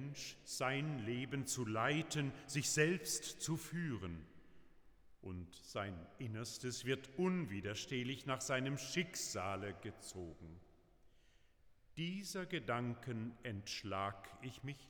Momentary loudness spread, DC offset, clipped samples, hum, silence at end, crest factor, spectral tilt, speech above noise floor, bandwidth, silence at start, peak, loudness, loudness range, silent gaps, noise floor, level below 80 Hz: 13 LU; under 0.1%; under 0.1%; none; 0 s; 22 dB; -4 dB/octave; 26 dB; over 20 kHz; 0 s; -22 dBFS; -42 LUFS; 8 LU; none; -69 dBFS; -68 dBFS